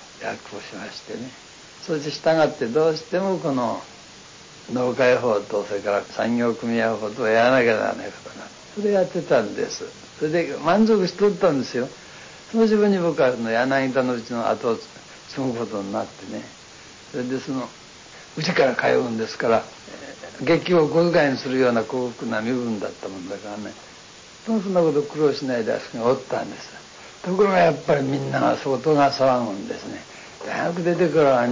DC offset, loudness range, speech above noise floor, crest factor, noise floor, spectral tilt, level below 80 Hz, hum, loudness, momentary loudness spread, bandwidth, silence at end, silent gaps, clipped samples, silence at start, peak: under 0.1%; 5 LU; 23 dB; 16 dB; -44 dBFS; -5.5 dB/octave; -60 dBFS; none; -22 LUFS; 20 LU; 7.6 kHz; 0 s; none; under 0.1%; 0 s; -8 dBFS